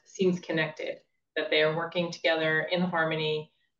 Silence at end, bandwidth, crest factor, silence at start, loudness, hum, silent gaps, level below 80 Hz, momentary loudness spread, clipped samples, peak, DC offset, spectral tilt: 0.35 s; 7.4 kHz; 16 dB; 0.15 s; -28 LUFS; none; none; -80 dBFS; 11 LU; under 0.1%; -12 dBFS; under 0.1%; -5.5 dB/octave